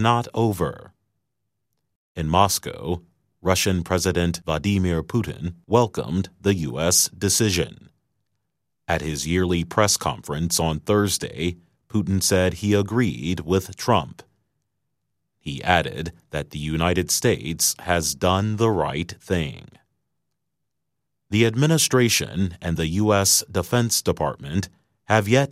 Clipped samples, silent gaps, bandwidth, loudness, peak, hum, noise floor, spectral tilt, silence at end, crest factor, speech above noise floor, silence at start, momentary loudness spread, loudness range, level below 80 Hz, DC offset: under 0.1%; 1.95-2.15 s; 16 kHz; -22 LUFS; 0 dBFS; none; -81 dBFS; -4 dB/octave; 0 s; 22 dB; 59 dB; 0 s; 11 LU; 5 LU; -44 dBFS; under 0.1%